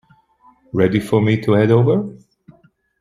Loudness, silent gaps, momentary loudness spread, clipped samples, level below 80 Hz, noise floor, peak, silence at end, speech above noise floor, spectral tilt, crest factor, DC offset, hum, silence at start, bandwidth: -16 LUFS; none; 9 LU; under 0.1%; -54 dBFS; -54 dBFS; -2 dBFS; 0.9 s; 39 dB; -8.5 dB/octave; 16 dB; under 0.1%; none; 0.75 s; 12 kHz